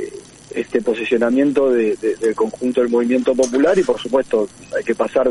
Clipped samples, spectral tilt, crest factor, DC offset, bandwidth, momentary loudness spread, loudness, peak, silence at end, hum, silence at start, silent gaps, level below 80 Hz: under 0.1%; -5 dB/octave; 14 dB; under 0.1%; 11.5 kHz; 9 LU; -18 LUFS; -4 dBFS; 0 s; none; 0 s; none; -54 dBFS